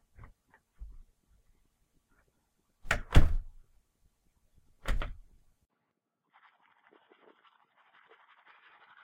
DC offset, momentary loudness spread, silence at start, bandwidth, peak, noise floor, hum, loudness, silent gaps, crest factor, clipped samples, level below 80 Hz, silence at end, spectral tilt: under 0.1%; 30 LU; 0.8 s; 11 kHz; -6 dBFS; -83 dBFS; none; -33 LUFS; none; 28 dB; under 0.1%; -36 dBFS; 3.9 s; -5.5 dB/octave